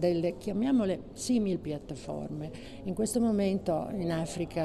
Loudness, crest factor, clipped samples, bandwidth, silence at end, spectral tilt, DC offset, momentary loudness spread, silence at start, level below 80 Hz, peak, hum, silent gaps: -31 LUFS; 14 dB; under 0.1%; 13.5 kHz; 0 s; -6 dB/octave; under 0.1%; 11 LU; 0 s; -54 dBFS; -18 dBFS; none; none